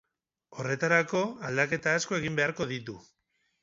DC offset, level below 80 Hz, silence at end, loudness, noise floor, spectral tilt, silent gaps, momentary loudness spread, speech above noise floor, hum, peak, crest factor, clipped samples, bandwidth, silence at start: under 0.1%; -66 dBFS; 0.6 s; -29 LUFS; -76 dBFS; -4.5 dB/octave; none; 15 LU; 47 dB; none; -8 dBFS; 22 dB; under 0.1%; 7.8 kHz; 0.5 s